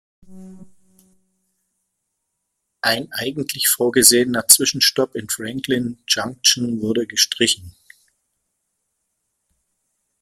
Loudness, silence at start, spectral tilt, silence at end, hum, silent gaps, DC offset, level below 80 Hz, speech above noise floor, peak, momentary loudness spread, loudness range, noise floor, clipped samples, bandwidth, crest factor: -17 LUFS; 0.3 s; -1.5 dB/octave; 2.5 s; none; none; under 0.1%; -60 dBFS; 57 dB; 0 dBFS; 13 LU; 9 LU; -76 dBFS; under 0.1%; 16.5 kHz; 22 dB